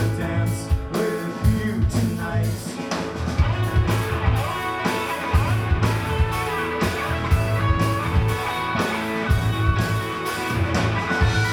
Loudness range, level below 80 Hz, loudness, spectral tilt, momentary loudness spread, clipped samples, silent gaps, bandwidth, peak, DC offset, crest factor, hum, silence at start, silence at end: 1 LU; -30 dBFS; -23 LUFS; -6 dB/octave; 4 LU; under 0.1%; none; 18.5 kHz; -6 dBFS; under 0.1%; 16 dB; none; 0 s; 0 s